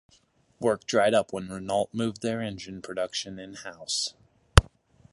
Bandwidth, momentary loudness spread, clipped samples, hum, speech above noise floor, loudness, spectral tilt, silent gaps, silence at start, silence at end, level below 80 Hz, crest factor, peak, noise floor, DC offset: 16 kHz; 15 LU; under 0.1%; none; 35 dB; -27 LUFS; -4.5 dB/octave; none; 0.6 s; 0.5 s; -36 dBFS; 28 dB; 0 dBFS; -64 dBFS; under 0.1%